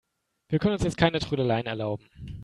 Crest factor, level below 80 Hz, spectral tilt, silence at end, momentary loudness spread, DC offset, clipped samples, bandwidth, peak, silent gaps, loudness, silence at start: 20 dB; -48 dBFS; -6.5 dB/octave; 0 s; 10 LU; under 0.1%; under 0.1%; 11.5 kHz; -6 dBFS; none; -27 LUFS; 0.5 s